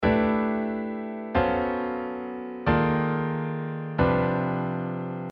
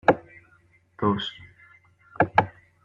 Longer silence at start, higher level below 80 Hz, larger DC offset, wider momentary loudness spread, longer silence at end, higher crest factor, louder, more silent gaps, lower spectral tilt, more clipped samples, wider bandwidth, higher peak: about the same, 0 s vs 0.05 s; first, -46 dBFS vs -58 dBFS; neither; second, 9 LU vs 13 LU; second, 0 s vs 0.35 s; second, 18 dB vs 26 dB; about the same, -27 LUFS vs -26 LUFS; neither; first, -10 dB/octave vs -7 dB/octave; neither; second, 5.4 kHz vs 7.4 kHz; second, -8 dBFS vs -2 dBFS